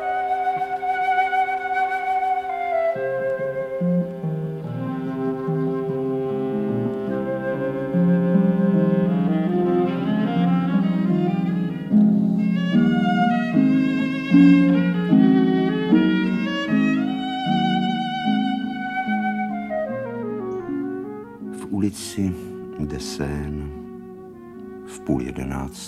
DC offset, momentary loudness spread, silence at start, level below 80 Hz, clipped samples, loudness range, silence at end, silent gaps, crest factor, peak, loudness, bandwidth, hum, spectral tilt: under 0.1%; 11 LU; 0 s; -48 dBFS; under 0.1%; 10 LU; 0 s; none; 18 dB; -4 dBFS; -21 LUFS; 12.5 kHz; none; -7.5 dB/octave